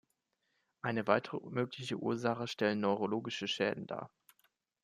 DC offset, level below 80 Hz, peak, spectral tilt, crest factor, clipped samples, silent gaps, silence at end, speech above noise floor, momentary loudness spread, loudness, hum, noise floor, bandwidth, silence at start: under 0.1%; -80 dBFS; -14 dBFS; -5.5 dB/octave; 24 dB; under 0.1%; none; 0.75 s; 47 dB; 10 LU; -36 LUFS; none; -82 dBFS; 14.5 kHz; 0.85 s